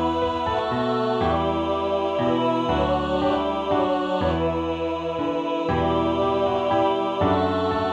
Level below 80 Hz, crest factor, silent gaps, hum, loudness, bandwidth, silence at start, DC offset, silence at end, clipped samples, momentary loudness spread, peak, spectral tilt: -42 dBFS; 16 dB; none; none; -23 LUFS; 9.6 kHz; 0 s; under 0.1%; 0 s; under 0.1%; 4 LU; -8 dBFS; -7 dB/octave